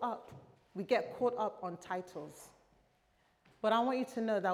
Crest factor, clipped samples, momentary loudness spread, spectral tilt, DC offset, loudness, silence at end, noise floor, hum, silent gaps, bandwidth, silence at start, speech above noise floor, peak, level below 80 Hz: 20 dB; under 0.1%; 17 LU; -5.5 dB/octave; under 0.1%; -36 LUFS; 0 s; -73 dBFS; none; none; 15 kHz; 0 s; 38 dB; -18 dBFS; -78 dBFS